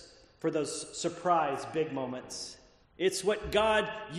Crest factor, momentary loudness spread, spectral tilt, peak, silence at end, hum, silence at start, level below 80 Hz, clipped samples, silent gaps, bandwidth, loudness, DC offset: 18 dB; 11 LU; -3.5 dB/octave; -14 dBFS; 0 s; none; 0 s; -56 dBFS; under 0.1%; none; 13 kHz; -31 LUFS; under 0.1%